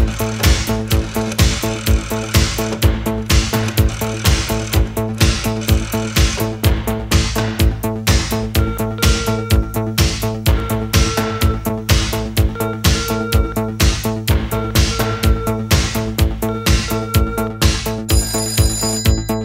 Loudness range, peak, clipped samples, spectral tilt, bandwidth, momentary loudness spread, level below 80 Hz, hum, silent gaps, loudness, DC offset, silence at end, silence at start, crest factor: 1 LU; 0 dBFS; under 0.1%; -4.5 dB/octave; 16.5 kHz; 3 LU; -20 dBFS; none; none; -17 LUFS; under 0.1%; 0 s; 0 s; 16 dB